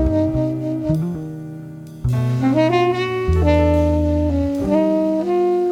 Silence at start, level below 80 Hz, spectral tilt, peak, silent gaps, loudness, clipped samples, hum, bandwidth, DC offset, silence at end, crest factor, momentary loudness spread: 0 s; -28 dBFS; -8.5 dB/octave; -4 dBFS; none; -18 LUFS; under 0.1%; none; 11.5 kHz; under 0.1%; 0 s; 14 dB; 12 LU